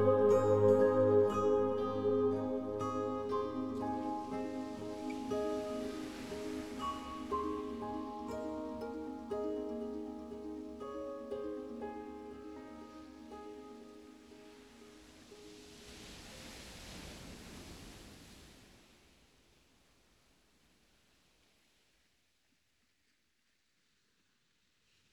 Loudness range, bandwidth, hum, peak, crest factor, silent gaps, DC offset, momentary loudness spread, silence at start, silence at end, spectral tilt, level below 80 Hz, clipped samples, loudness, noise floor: 20 LU; 13 kHz; none; -18 dBFS; 22 dB; none; under 0.1%; 25 LU; 0 s; 6.35 s; -6.5 dB/octave; -64 dBFS; under 0.1%; -36 LUFS; -79 dBFS